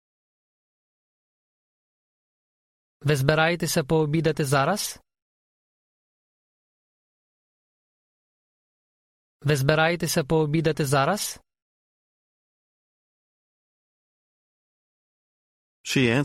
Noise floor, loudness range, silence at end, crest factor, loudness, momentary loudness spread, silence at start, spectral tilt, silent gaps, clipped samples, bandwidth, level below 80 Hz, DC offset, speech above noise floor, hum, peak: under -90 dBFS; 9 LU; 0 s; 24 dB; -23 LUFS; 10 LU; 3.05 s; -5 dB/octave; 5.22-9.40 s, 11.62-15.84 s; under 0.1%; 16 kHz; -56 dBFS; under 0.1%; over 68 dB; none; -4 dBFS